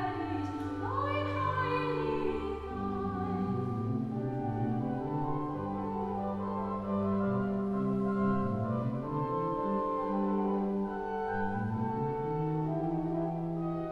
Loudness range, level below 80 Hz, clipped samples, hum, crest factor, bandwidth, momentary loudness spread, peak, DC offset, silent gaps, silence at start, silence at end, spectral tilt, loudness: 2 LU; -54 dBFS; under 0.1%; none; 14 dB; 6.6 kHz; 4 LU; -20 dBFS; under 0.1%; none; 0 s; 0 s; -9.5 dB/octave; -33 LUFS